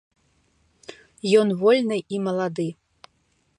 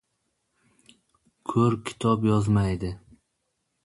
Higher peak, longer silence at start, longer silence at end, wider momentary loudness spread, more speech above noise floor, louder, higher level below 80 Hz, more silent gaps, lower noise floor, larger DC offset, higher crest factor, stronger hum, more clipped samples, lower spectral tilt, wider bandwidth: first, -4 dBFS vs -10 dBFS; second, 0.9 s vs 1.5 s; about the same, 0.85 s vs 0.85 s; first, 25 LU vs 14 LU; second, 46 dB vs 54 dB; first, -22 LUFS vs -25 LUFS; second, -70 dBFS vs -48 dBFS; neither; second, -67 dBFS vs -77 dBFS; neither; about the same, 20 dB vs 18 dB; neither; neither; second, -6 dB/octave vs -7.5 dB/octave; about the same, 11 kHz vs 11.5 kHz